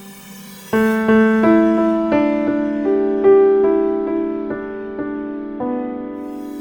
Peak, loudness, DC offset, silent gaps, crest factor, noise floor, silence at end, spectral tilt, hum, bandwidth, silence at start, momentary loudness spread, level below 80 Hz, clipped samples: -2 dBFS; -17 LUFS; under 0.1%; none; 14 dB; -37 dBFS; 0 s; -7 dB/octave; none; 19 kHz; 0 s; 15 LU; -50 dBFS; under 0.1%